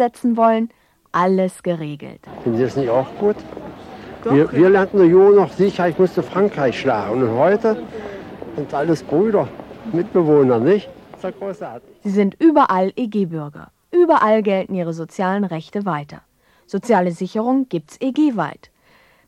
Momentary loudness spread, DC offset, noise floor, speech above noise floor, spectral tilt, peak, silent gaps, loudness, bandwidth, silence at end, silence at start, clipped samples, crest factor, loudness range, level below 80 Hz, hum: 17 LU; under 0.1%; -54 dBFS; 37 dB; -7.5 dB/octave; -2 dBFS; none; -17 LUFS; 11.5 kHz; 0.75 s; 0 s; under 0.1%; 16 dB; 6 LU; -56 dBFS; none